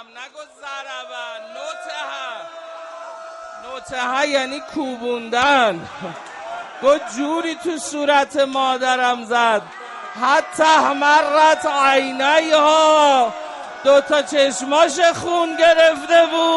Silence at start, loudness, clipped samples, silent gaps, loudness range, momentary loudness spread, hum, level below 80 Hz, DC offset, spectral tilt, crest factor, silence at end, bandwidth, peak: 0 s; -16 LUFS; under 0.1%; none; 11 LU; 19 LU; none; -62 dBFS; under 0.1%; -2 dB/octave; 16 dB; 0 s; 11.5 kHz; -2 dBFS